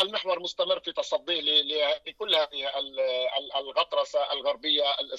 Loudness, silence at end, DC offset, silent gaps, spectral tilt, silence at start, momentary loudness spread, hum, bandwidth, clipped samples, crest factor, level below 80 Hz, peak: -27 LUFS; 0 s; under 0.1%; none; -1.5 dB/octave; 0 s; 7 LU; none; 11 kHz; under 0.1%; 16 dB; -70 dBFS; -12 dBFS